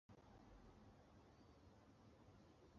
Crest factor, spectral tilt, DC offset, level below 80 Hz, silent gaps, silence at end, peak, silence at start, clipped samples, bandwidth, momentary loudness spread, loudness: 14 dB; -6 dB/octave; under 0.1%; -74 dBFS; none; 0 s; -54 dBFS; 0.1 s; under 0.1%; 7 kHz; 2 LU; -69 LUFS